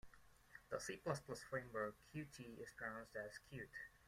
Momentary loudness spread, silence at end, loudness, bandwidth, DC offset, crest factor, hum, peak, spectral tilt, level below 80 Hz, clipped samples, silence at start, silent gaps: 9 LU; 0 s; -50 LUFS; 16 kHz; under 0.1%; 22 dB; none; -28 dBFS; -4.5 dB/octave; -74 dBFS; under 0.1%; 0.05 s; none